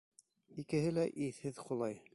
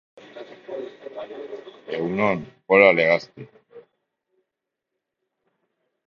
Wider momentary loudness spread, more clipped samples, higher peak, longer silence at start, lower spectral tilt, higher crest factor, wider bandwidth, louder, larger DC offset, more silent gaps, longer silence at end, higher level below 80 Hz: second, 13 LU vs 26 LU; neither; second, -24 dBFS vs 0 dBFS; first, 0.5 s vs 0.35 s; about the same, -7 dB/octave vs -6.5 dB/octave; second, 16 dB vs 24 dB; first, 11.5 kHz vs 7 kHz; second, -38 LUFS vs -19 LUFS; neither; neither; second, 0.15 s vs 2.25 s; second, -70 dBFS vs -64 dBFS